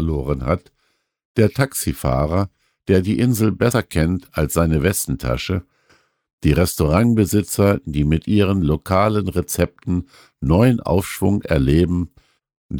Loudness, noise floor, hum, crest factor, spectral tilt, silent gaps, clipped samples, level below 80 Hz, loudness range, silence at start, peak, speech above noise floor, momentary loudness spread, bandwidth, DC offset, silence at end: -19 LUFS; -59 dBFS; none; 16 dB; -6.5 dB/octave; 1.25-1.35 s, 6.33-6.38 s, 12.57-12.69 s; under 0.1%; -32 dBFS; 3 LU; 0 s; -4 dBFS; 41 dB; 8 LU; over 20 kHz; under 0.1%; 0 s